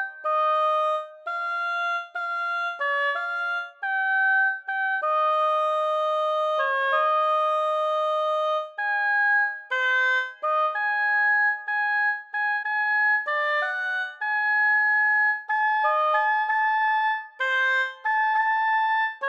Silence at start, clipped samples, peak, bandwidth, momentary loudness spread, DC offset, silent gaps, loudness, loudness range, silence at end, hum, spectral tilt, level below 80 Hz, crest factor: 0 s; under 0.1%; -10 dBFS; 9.2 kHz; 7 LU; under 0.1%; none; -23 LUFS; 3 LU; 0 s; none; 3.5 dB/octave; under -90 dBFS; 14 dB